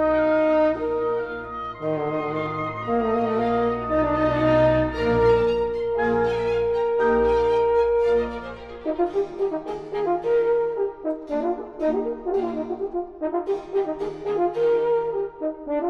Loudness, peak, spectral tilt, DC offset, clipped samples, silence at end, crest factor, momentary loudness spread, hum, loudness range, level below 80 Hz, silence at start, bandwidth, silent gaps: -23 LUFS; -8 dBFS; -8 dB/octave; under 0.1%; under 0.1%; 0 s; 14 dB; 10 LU; none; 5 LU; -44 dBFS; 0 s; 6.8 kHz; none